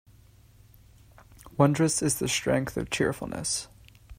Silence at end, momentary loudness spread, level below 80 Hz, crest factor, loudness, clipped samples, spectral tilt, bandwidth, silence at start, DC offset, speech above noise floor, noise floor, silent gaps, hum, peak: 0.05 s; 9 LU; -52 dBFS; 24 dB; -27 LUFS; under 0.1%; -4.5 dB/octave; 16 kHz; 1.45 s; under 0.1%; 29 dB; -56 dBFS; none; none; -6 dBFS